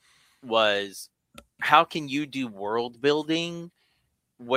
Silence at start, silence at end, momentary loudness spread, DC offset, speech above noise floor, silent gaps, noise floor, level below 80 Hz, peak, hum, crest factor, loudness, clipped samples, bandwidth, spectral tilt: 0.45 s; 0 s; 19 LU; under 0.1%; 48 dB; none; -73 dBFS; -72 dBFS; -2 dBFS; none; 26 dB; -25 LUFS; under 0.1%; 16 kHz; -4 dB/octave